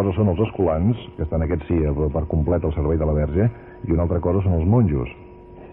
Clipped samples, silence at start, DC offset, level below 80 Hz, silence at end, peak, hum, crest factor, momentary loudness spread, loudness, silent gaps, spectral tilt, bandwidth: under 0.1%; 0 s; under 0.1%; -30 dBFS; 0 s; -6 dBFS; none; 14 dB; 6 LU; -21 LUFS; none; -13.5 dB/octave; 3.6 kHz